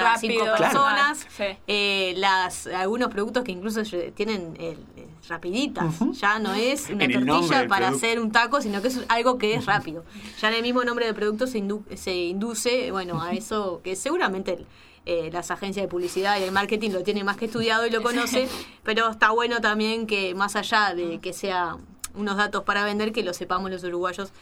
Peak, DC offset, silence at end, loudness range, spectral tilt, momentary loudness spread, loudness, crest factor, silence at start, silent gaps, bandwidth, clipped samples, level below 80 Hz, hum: -4 dBFS; under 0.1%; 0.05 s; 5 LU; -3.5 dB/octave; 10 LU; -24 LUFS; 22 dB; 0 s; none; 17 kHz; under 0.1%; -56 dBFS; none